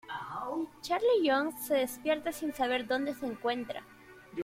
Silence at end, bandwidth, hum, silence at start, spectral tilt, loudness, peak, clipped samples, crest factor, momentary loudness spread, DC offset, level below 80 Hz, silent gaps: 0 s; 16.5 kHz; none; 0.05 s; -3.5 dB/octave; -32 LUFS; -16 dBFS; under 0.1%; 16 dB; 11 LU; under 0.1%; -68 dBFS; none